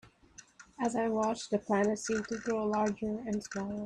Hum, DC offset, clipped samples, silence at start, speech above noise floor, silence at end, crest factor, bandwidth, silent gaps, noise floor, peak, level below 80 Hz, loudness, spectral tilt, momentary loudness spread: none; under 0.1%; under 0.1%; 0.05 s; 26 dB; 0 s; 16 dB; 10.5 kHz; none; -58 dBFS; -18 dBFS; -64 dBFS; -33 LUFS; -5 dB/octave; 6 LU